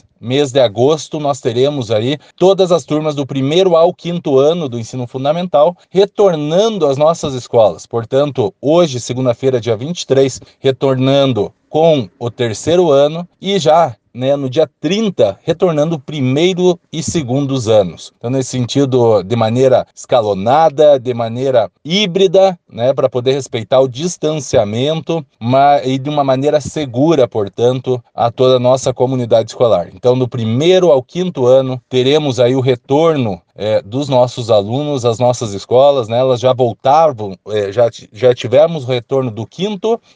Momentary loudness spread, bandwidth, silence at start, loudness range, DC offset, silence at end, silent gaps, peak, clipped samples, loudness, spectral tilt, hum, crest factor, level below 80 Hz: 8 LU; 9.8 kHz; 0.2 s; 2 LU; under 0.1%; 0.2 s; none; 0 dBFS; under 0.1%; -13 LUFS; -6 dB/octave; none; 12 dB; -52 dBFS